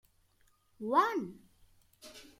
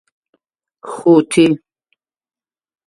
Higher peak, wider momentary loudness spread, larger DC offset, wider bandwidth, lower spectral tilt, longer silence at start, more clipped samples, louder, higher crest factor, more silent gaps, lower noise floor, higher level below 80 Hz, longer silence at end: second, -14 dBFS vs 0 dBFS; first, 23 LU vs 20 LU; neither; first, 16 kHz vs 11.5 kHz; about the same, -5 dB/octave vs -5.5 dB/octave; about the same, 0.8 s vs 0.85 s; neither; second, -32 LUFS vs -13 LUFS; about the same, 22 dB vs 18 dB; neither; about the same, -70 dBFS vs -69 dBFS; second, -72 dBFS vs -60 dBFS; second, 0.15 s vs 1.3 s